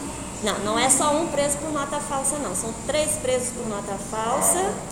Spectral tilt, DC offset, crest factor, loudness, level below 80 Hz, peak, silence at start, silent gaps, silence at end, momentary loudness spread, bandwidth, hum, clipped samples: -2.5 dB/octave; under 0.1%; 20 dB; -23 LUFS; -46 dBFS; -4 dBFS; 0 s; none; 0 s; 10 LU; 17.5 kHz; none; under 0.1%